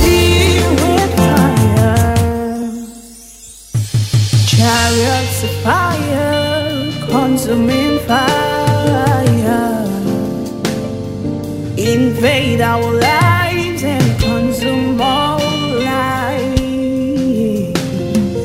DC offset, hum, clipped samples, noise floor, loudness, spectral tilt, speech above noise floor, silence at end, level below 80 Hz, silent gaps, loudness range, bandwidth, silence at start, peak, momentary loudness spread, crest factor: under 0.1%; none; under 0.1%; -36 dBFS; -14 LUFS; -5.5 dB/octave; 24 dB; 0 s; -30 dBFS; none; 3 LU; 16.5 kHz; 0 s; 0 dBFS; 10 LU; 14 dB